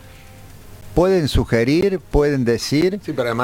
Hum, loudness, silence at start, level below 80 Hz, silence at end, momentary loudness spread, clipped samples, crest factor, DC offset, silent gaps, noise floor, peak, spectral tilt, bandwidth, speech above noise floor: none; -18 LUFS; 0.05 s; -32 dBFS; 0 s; 5 LU; under 0.1%; 16 dB; under 0.1%; none; -40 dBFS; -2 dBFS; -6 dB/octave; 17 kHz; 23 dB